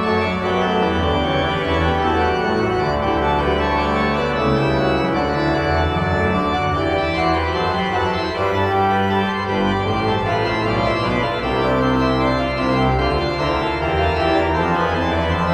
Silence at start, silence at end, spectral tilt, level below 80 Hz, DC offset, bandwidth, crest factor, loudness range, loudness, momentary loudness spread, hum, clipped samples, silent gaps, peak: 0 s; 0 s; -6.5 dB/octave; -32 dBFS; under 0.1%; 12 kHz; 12 dB; 1 LU; -18 LUFS; 2 LU; none; under 0.1%; none; -6 dBFS